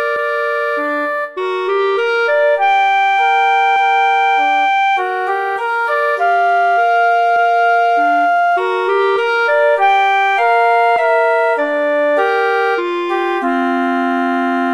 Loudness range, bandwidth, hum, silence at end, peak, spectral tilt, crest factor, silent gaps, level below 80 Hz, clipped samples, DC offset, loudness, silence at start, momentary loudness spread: 2 LU; 12 kHz; none; 0 s; -2 dBFS; -2.5 dB/octave; 12 dB; none; -68 dBFS; under 0.1%; under 0.1%; -14 LUFS; 0 s; 5 LU